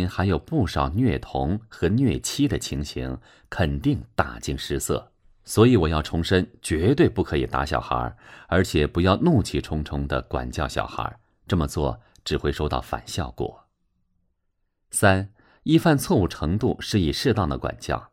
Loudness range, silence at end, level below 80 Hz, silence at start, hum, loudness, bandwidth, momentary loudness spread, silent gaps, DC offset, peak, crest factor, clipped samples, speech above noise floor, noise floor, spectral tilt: 6 LU; 0.05 s; -38 dBFS; 0 s; none; -24 LUFS; 16 kHz; 11 LU; none; under 0.1%; -4 dBFS; 20 dB; under 0.1%; 50 dB; -73 dBFS; -5.5 dB/octave